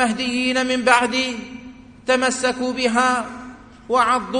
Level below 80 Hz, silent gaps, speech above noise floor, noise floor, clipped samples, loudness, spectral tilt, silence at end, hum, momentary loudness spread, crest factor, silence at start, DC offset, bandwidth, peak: -52 dBFS; none; 22 dB; -41 dBFS; under 0.1%; -19 LUFS; -2.5 dB/octave; 0 s; none; 18 LU; 20 dB; 0 s; under 0.1%; 10.5 kHz; 0 dBFS